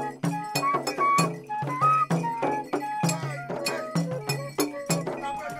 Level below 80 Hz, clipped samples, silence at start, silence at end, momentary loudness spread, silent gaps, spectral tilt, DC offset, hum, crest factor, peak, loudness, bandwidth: -66 dBFS; under 0.1%; 0 s; 0 s; 8 LU; none; -4.5 dB/octave; under 0.1%; none; 18 dB; -8 dBFS; -27 LUFS; 16 kHz